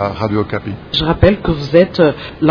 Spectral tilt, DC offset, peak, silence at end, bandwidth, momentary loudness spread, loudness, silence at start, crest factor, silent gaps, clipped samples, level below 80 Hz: -8 dB/octave; under 0.1%; 0 dBFS; 0 s; 5.4 kHz; 7 LU; -14 LUFS; 0 s; 14 dB; none; 0.3%; -30 dBFS